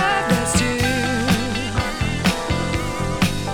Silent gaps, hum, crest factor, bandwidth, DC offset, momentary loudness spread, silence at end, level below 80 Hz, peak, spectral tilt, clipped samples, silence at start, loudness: none; none; 18 dB; 20 kHz; under 0.1%; 5 LU; 0 s; -32 dBFS; -2 dBFS; -4.5 dB/octave; under 0.1%; 0 s; -20 LUFS